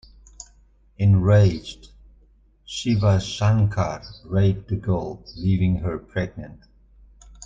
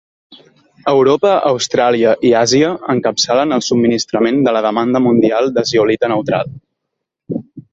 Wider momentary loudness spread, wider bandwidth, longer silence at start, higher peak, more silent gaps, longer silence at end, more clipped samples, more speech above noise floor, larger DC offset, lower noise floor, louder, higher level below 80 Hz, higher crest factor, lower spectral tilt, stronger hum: first, 22 LU vs 8 LU; about the same, 7.8 kHz vs 8 kHz; first, 1 s vs 0.3 s; second, -6 dBFS vs 0 dBFS; neither; about the same, 0 s vs 0.1 s; neither; second, 35 dB vs 63 dB; neither; second, -56 dBFS vs -76 dBFS; second, -22 LUFS vs -13 LUFS; first, -44 dBFS vs -54 dBFS; about the same, 18 dB vs 14 dB; first, -7 dB/octave vs -4.5 dB/octave; neither